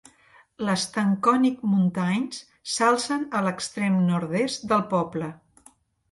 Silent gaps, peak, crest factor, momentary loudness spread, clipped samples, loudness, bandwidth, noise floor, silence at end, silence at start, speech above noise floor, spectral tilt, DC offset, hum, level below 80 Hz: none; -8 dBFS; 18 dB; 9 LU; under 0.1%; -24 LUFS; 11.5 kHz; -58 dBFS; 0.75 s; 0.6 s; 34 dB; -5.5 dB/octave; under 0.1%; none; -66 dBFS